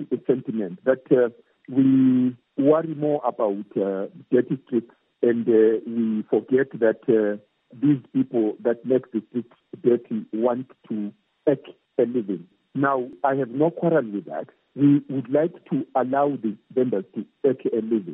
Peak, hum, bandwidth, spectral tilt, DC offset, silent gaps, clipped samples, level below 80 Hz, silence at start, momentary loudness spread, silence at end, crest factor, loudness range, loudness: -6 dBFS; none; 3.8 kHz; -12 dB/octave; under 0.1%; none; under 0.1%; -78 dBFS; 0 s; 12 LU; 0 s; 18 dB; 4 LU; -23 LUFS